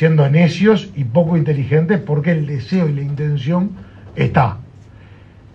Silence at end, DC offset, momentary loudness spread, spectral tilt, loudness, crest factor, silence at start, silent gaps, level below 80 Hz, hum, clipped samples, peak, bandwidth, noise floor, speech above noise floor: 0.7 s; under 0.1%; 8 LU; -8.5 dB/octave; -16 LUFS; 16 dB; 0 s; none; -46 dBFS; none; under 0.1%; 0 dBFS; 7 kHz; -41 dBFS; 26 dB